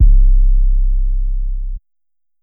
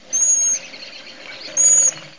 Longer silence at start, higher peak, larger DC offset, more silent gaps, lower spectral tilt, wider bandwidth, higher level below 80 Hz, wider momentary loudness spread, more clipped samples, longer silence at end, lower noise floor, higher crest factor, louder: about the same, 0 s vs 0.1 s; about the same, -2 dBFS vs -4 dBFS; second, under 0.1% vs 0.4%; neither; first, -15 dB/octave vs 1.5 dB/octave; second, 0.3 kHz vs 7.6 kHz; first, -12 dBFS vs -70 dBFS; second, 14 LU vs 24 LU; neither; first, 0.65 s vs 0.1 s; first, -87 dBFS vs -37 dBFS; about the same, 10 dB vs 14 dB; second, -19 LUFS vs -13 LUFS